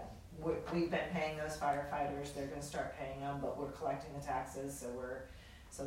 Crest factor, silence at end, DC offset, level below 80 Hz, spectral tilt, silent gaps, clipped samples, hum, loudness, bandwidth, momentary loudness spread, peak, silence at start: 18 dB; 0 s; under 0.1%; -58 dBFS; -5.5 dB/octave; none; under 0.1%; none; -41 LUFS; 16 kHz; 9 LU; -22 dBFS; 0 s